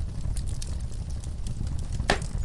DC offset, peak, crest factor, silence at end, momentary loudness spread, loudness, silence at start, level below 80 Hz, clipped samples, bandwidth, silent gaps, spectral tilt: under 0.1%; -6 dBFS; 22 dB; 0 s; 8 LU; -32 LUFS; 0 s; -32 dBFS; under 0.1%; 11.5 kHz; none; -5 dB/octave